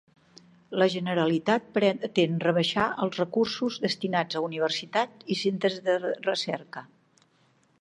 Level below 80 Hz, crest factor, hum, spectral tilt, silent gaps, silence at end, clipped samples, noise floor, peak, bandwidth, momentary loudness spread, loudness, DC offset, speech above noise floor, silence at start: -70 dBFS; 20 dB; none; -5.5 dB/octave; none; 0.95 s; under 0.1%; -65 dBFS; -8 dBFS; 11 kHz; 6 LU; -27 LUFS; under 0.1%; 39 dB; 0.7 s